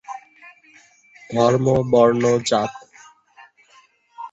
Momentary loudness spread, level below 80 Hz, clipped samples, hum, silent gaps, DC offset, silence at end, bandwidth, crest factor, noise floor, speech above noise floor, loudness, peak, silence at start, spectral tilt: 22 LU; -54 dBFS; under 0.1%; none; none; under 0.1%; 0.05 s; 8.2 kHz; 20 dB; -55 dBFS; 38 dB; -18 LUFS; -2 dBFS; 0.1 s; -6 dB/octave